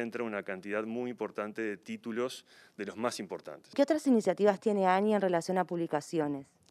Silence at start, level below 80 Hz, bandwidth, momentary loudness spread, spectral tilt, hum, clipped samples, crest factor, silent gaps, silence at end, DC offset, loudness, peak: 0 s; -84 dBFS; 13.5 kHz; 13 LU; -5.5 dB/octave; none; under 0.1%; 20 dB; none; 0.3 s; under 0.1%; -32 LUFS; -12 dBFS